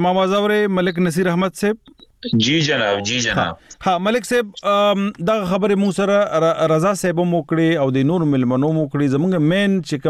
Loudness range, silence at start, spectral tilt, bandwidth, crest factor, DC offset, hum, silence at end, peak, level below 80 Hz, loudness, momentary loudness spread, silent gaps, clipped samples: 2 LU; 0 s; -5.5 dB/octave; 14.5 kHz; 12 dB; under 0.1%; none; 0 s; -6 dBFS; -52 dBFS; -18 LUFS; 4 LU; none; under 0.1%